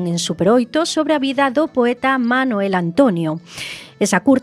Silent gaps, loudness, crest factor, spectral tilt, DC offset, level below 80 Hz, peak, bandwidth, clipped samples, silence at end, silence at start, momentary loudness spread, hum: none; -17 LUFS; 16 dB; -5 dB/octave; under 0.1%; -56 dBFS; 0 dBFS; 14.5 kHz; under 0.1%; 0 s; 0 s; 9 LU; none